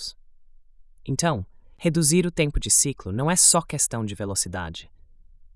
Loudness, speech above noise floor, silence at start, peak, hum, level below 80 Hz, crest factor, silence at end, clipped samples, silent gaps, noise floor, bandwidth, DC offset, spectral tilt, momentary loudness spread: -21 LUFS; 26 dB; 0 s; -4 dBFS; none; -40 dBFS; 22 dB; 0.7 s; under 0.1%; none; -49 dBFS; 12 kHz; under 0.1%; -3.5 dB/octave; 19 LU